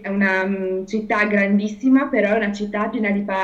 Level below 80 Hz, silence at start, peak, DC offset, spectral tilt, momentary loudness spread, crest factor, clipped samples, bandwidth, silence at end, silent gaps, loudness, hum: -54 dBFS; 0 s; -4 dBFS; under 0.1%; -7 dB/octave; 7 LU; 14 dB; under 0.1%; 7.6 kHz; 0 s; none; -19 LUFS; none